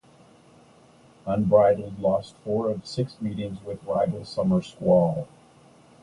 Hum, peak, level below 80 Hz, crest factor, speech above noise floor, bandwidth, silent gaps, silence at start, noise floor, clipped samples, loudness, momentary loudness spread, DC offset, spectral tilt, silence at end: none; -6 dBFS; -54 dBFS; 20 dB; 30 dB; 11 kHz; none; 1.25 s; -54 dBFS; under 0.1%; -25 LUFS; 14 LU; under 0.1%; -8 dB/octave; 0.75 s